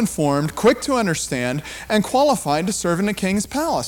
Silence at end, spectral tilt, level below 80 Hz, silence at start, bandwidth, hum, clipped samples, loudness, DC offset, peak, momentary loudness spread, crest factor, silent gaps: 0 s; -4.5 dB/octave; -46 dBFS; 0 s; 18.5 kHz; none; under 0.1%; -20 LUFS; under 0.1%; -6 dBFS; 5 LU; 14 dB; none